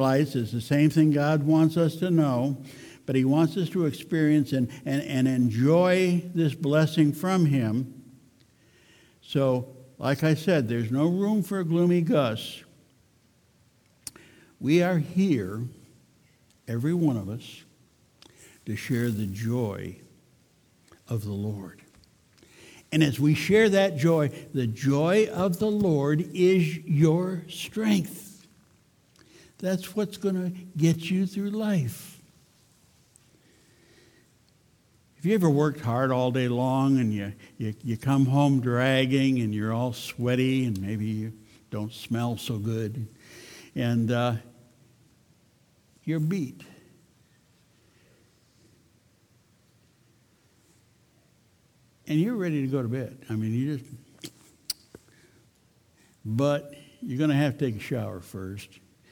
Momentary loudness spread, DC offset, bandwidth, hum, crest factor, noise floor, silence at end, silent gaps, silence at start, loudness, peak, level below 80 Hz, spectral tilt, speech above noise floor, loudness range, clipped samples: 16 LU; under 0.1%; 20 kHz; none; 20 dB; -63 dBFS; 0.45 s; none; 0 s; -26 LUFS; -8 dBFS; -66 dBFS; -7 dB/octave; 38 dB; 10 LU; under 0.1%